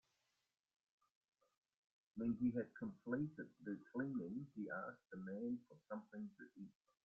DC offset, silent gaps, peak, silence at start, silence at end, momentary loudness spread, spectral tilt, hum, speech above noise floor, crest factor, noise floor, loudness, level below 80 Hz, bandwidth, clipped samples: under 0.1%; none; -30 dBFS; 2.15 s; 0.35 s; 14 LU; -9 dB/octave; none; 40 dB; 18 dB; -87 dBFS; -48 LUFS; -82 dBFS; 2.8 kHz; under 0.1%